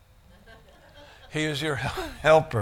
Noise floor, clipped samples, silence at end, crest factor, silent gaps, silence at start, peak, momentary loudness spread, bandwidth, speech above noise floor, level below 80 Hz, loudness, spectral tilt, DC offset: -54 dBFS; under 0.1%; 0 s; 22 dB; none; 0.95 s; -6 dBFS; 11 LU; 16 kHz; 30 dB; -48 dBFS; -25 LUFS; -5 dB/octave; under 0.1%